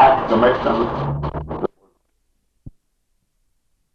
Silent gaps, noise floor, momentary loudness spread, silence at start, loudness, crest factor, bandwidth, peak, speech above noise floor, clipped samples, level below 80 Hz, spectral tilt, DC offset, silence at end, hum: none; -67 dBFS; 12 LU; 0 s; -19 LUFS; 18 dB; 6.8 kHz; -4 dBFS; 49 dB; under 0.1%; -40 dBFS; -8 dB/octave; under 0.1%; 1.25 s; none